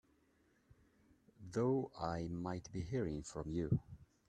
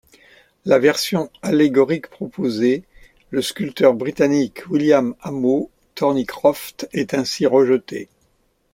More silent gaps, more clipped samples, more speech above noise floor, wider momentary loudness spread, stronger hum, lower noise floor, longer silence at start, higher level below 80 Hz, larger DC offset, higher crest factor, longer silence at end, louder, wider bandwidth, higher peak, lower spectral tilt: neither; neither; second, 35 dB vs 45 dB; about the same, 8 LU vs 10 LU; neither; first, -75 dBFS vs -63 dBFS; first, 1.4 s vs 0.65 s; about the same, -62 dBFS vs -58 dBFS; neither; about the same, 20 dB vs 18 dB; second, 0.25 s vs 0.7 s; second, -41 LUFS vs -19 LUFS; second, 10 kHz vs 16.5 kHz; second, -22 dBFS vs -2 dBFS; first, -7.5 dB/octave vs -5.5 dB/octave